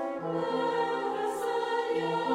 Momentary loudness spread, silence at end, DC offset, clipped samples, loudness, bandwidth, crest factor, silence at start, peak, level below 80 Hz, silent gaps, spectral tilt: 2 LU; 0 s; under 0.1%; under 0.1%; -30 LUFS; 15.5 kHz; 14 dB; 0 s; -16 dBFS; -74 dBFS; none; -5 dB/octave